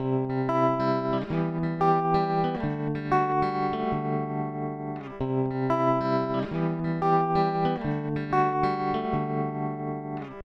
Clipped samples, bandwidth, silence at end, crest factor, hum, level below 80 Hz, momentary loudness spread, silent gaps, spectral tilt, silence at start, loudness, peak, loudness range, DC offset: under 0.1%; 6.8 kHz; 0 s; 16 dB; none; -52 dBFS; 8 LU; none; -9 dB/octave; 0 s; -27 LUFS; -10 dBFS; 2 LU; under 0.1%